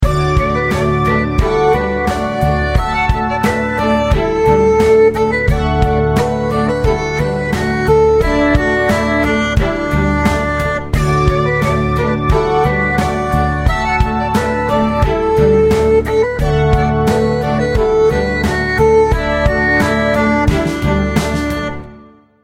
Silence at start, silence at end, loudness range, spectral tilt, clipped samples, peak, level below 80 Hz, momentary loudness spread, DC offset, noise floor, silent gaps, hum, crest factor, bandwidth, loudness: 0 s; 0.4 s; 2 LU; -6.5 dB/octave; under 0.1%; 0 dBFS; -22 dBFS; 5 LU; under 0.1%; -41 dBFS; none; none; 12 dB; 16 kHz; -14 LUFS